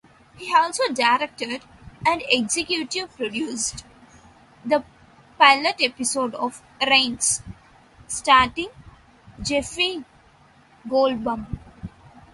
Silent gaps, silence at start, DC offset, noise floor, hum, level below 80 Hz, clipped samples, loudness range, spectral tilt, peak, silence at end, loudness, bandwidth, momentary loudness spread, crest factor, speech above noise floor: none; 0.35 s; under 0.1%; -54 dBFS; none; -50 dBFS; under 0.1%; 6 LU; -2 dB/octave; -2 dBFS; 0.45 s; -21 LUFS; 12 kHz; 18 LU; 22 dB; 32 dB